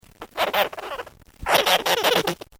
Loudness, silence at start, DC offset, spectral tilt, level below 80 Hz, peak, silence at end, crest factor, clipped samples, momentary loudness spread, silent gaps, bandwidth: -21 LUFS; 0.2 s; under 0.1%; -2 dB/octave; -50 dBFS; -4 dBFS; 0.25 s; 20 dB; under 0.1%; 17 LU; none; over 20 kHz